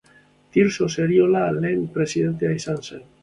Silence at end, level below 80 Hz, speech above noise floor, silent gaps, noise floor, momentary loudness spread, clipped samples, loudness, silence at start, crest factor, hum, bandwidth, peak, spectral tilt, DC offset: 0.2 s; -56 dBFS; 34 dB; none; -55 dBFS; 10 LU; under 0.1%; -21 LUFS; 0.55 s; 16 dB; none; 11 kHz; -6 dBFS; -6.5 dB/octave; under 0.1%